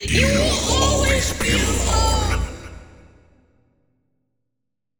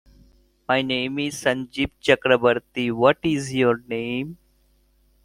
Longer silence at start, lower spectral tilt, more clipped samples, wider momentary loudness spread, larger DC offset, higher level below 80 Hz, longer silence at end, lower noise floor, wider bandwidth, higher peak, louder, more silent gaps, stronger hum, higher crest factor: second, 0 s vs 0.7 s; second, -3.5 dB/octave vs -5 dB/octave; neither; about the same, 11 LU vs 9 LU; neither; first, -26 dBFS vs -54 dBFS; first, 2.15 s vs 0.9 s; first, -82 dBFS vs -61 dBFS; first, over 20 kHz vs 15.5 kHz; about the same, -4 dBFS vs -2 dBFS; first, -19 LUFS vs -22 LUFS; neither; neither; about the same, 18 dB vs 20 dB